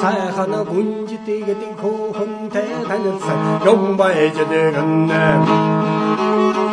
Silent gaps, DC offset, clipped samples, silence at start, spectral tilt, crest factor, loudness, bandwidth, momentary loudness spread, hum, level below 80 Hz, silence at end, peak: none; under 0.1%; under 0.1%; 0 s; -7 dB/octave; 16 dB; -17 LUFS; 10.5 kHz; 9 LU; none; -56 dBFS; 0 s; 0 dBFS